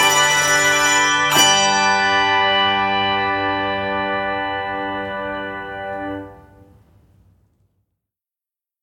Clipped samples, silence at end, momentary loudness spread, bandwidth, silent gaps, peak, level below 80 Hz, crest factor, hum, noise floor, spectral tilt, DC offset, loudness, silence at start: under 0.1%; 2.45 s; 15 LU; 18 kHz; none; 0 dBFS; -52 dBFS; 18 dB; none; -90 dBFS; -1 dB/octave; under 0.1%; -16 LUFS; 0 s